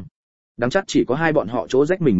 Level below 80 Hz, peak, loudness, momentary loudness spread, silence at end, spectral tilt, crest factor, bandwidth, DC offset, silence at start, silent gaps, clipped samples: -50 dBFS; -2 dBFS; -20 LUFS; 4 LU; 0 s; -6 dB/octave; 18 dB; 8 kHz; 0.9%; 0 s; 0.11-0.55 s; under 0.1%